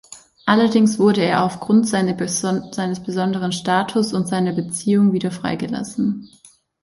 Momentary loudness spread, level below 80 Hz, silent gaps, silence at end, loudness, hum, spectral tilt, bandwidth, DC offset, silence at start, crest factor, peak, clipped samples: 9 LU; -58 dBFS; none; 0.55 s; -19 LUFS; none; -5.5 dB/octave; 11.5 kHz; under 0.1%; 0.1 s; 16 dB; -2 dBFS; under 0.1%